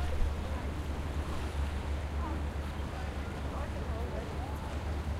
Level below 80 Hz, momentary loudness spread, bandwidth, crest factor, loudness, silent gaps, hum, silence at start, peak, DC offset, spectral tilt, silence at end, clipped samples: -36 dBFS; 3 LU; 13.5 kHz; 16 dB; -37 LUFS; none; none; 0 s; -18 dBFS; under 0.1%; -6.5 dB/octave; 0 s; under 0.1%